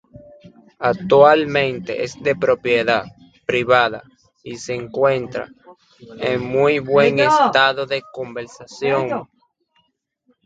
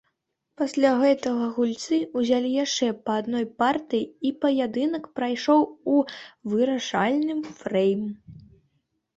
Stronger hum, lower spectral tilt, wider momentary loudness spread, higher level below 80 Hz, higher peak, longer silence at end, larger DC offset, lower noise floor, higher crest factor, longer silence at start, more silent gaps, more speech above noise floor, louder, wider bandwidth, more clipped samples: neither; about the same, -5 dB/octave vs -4.5 dB/octave; first, 17 LU vs 8 LU; first, -56 dBFS vs -68 dBFS; first, 0 dBFS vs -6 dBFS; first, 1.2 s vs 0.8 s; neither; second, -67 dBFS vs -77 dBFS; about the same, 18 dB vs 18 dB; second, 0.15 s vs 0.6 s; neither; second, 49 dB vs 53 dB; first, -17 LUFS vs -24 LUFS; about the same, 9 kHz vs 8.2 kHz; neither